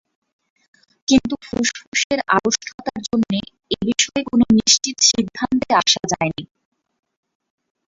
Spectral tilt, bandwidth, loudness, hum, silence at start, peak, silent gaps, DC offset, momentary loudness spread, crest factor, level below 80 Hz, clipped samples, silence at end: -2.5 dB/octave; 7.8 kHz; -18 LUFS; none; 1.1 s; -2 dBFS; 1.87-1.92 s, 2.04-2.10 s, 2.74-2.78 s; under 0.1%; 11 LU; 20 dB; -50 dBFS; under 0.1%; 1.45 s